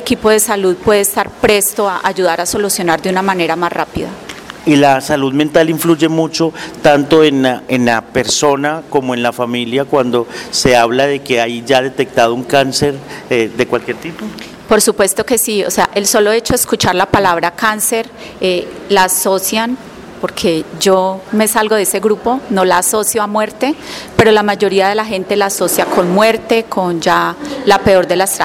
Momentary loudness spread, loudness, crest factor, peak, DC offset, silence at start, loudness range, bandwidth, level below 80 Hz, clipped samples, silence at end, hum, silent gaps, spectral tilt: 8 LU; -13 LUFS; 12 dB; 0 dBFS; under 0.1%; 0 s; 2 LU; 17 kHz; -42 dBFS; under 0.1%; 0 s; none; none; -3.5 dB/octave